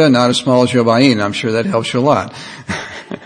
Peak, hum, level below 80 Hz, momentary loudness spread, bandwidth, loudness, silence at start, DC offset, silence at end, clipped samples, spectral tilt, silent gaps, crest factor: 0 dBFS; none; -54 dBFS; 14 LU; 9.8 kHz; -14 LUFS; 0 s; under 0.1%; 0.05 s; 0.2%; -5.5 dB/octave; none; 14 dB